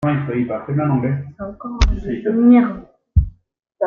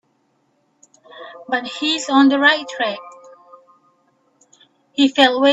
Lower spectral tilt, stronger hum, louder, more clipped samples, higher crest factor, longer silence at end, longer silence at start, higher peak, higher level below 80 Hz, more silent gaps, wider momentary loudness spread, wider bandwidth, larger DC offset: first, -8 dB/octave vs -2 dB/octave; neither; about the same, -18 LUFS vs -16 LUFS; neither; about the same, 16 dB vs 20 dB; about the same, 0 s vs 0 s; second, 0 s vs 1.15 s; about the same, -2 dBFS vs 0 dBFS; first, -26 dBFS vs -68 dBFS; neither; second, 18 LU vs 21 LU; second, 7 kHz vs 8 kHz; neither